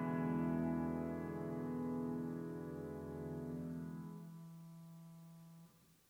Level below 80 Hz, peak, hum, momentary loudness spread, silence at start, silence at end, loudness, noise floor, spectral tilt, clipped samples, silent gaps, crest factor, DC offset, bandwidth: -72 dBFS; -28 dBFS; none; 19 LU; 0 s; 0.15 s; -43 LUFS; -65 dBFS; -9 dB/octave; under 0.1%; none; 16 dB; under 0.1%; 16.5 kHz